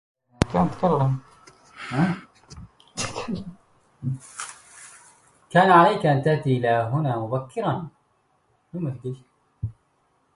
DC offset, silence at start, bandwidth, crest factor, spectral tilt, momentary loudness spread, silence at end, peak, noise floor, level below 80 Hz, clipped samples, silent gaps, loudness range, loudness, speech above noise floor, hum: under 0.1%; 0.4 s; 11.5 kHz; 24 dB; -6.5 dB/octave; 20 LU; 0.65 s; 0 dBFS; -67 dBFS; -50 dBFS; under 0.1%; none; 11 LU; -23 LUFS; 45 dB; none